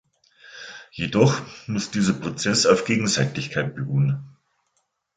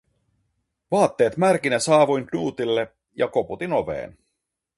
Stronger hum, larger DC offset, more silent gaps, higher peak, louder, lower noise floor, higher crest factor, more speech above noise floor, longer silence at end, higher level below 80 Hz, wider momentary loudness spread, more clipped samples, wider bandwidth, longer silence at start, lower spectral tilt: neither; neither; neither; about the same, -2 dBFS vs -4 dBFS; about the same, -22 LUFS vs -22 LUFS; second, -72 dBFS vs -79 dBFS; about the same, 22 dB vs 18 dB; second, 50 dB vs 58 dB; first, 0.85 s vs 0.65 s; about the same, -56 dBFS vs -58 dBFS; first, 14 LU vs 11 LU; neither; second, 9.4 kHz vs 11.5 kHz; second, 0.45 s vs 0.9 s; about the same, -4.5 dB/octave vs -5 dB/octave